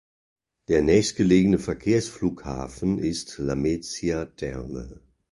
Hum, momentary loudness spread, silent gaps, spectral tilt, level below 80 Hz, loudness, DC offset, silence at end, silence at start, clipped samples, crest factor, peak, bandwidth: none; 14 LU; none; -6 dB/octave; -44 dBFS; -24 LUFS; under 0.1%; 0.4 s; 0.7 s; under 0.1%; 18 dB; -6 dBFS; 11.5 kHz